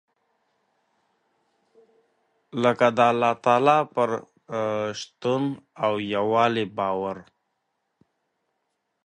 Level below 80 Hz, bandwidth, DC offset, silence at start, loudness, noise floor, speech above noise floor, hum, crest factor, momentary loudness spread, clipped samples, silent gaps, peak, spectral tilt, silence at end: -68 dBFS; 10 kHz; under 0.1%; 2.55 s; -23 LUFS; -77 dBFS; 54 dB; none; 22 dB; 12 LU; under 0.1%; none; -4 dBFS; -5.5 dB/octave; 1.85 s